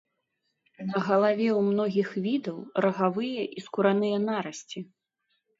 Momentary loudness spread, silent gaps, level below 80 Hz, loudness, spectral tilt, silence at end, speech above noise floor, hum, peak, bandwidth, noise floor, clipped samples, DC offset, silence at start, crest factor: 14 LU; none; -76 dBFS; -27 LUFS; -6.5 dB/octave; 0.75 s; 52 dB; none; -8 dBFS; 7.8 kHz; -79 dBFS; under 0.1%; under 0.1%; 0.8 s; 18 dB